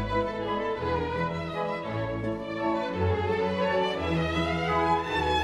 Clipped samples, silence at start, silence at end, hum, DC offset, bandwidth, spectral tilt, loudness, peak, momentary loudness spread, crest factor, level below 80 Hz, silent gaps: under 0.1%; 0 s; 0 s; none; under 0.1%; 12.5 kHz; -6.5 dB/octave; -28 LUFS; -14 dBFS; 5 LU; 14 dB; -44 dBFS; none